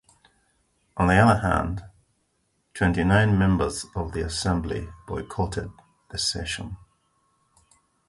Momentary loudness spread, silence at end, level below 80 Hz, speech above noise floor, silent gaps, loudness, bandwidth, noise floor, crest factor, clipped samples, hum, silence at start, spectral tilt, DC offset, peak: 17 LU; 1.3 s; -38 dBFS; 48 dB; none; -24 LUFS; 11.5 kHz; -71 dBFS; 22 dB; under 0.1%; none; 0.95 s; -5.5 dB/octave; under 0.1%; -4 dBFS